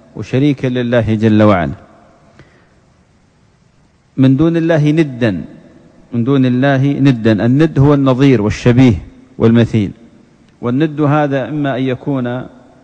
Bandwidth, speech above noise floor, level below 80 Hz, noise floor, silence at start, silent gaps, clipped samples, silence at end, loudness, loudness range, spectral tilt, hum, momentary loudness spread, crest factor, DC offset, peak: 8.4 kHz; 40 dB; -40 dBFS; -51 dBFS; 0.15 s; none; under 0.1%; 0.35 s; -13 LUFS; 6 LU; -8.5 dB/octave; none; 12 LU; 14 dB; under 0.1%; 0 dBFS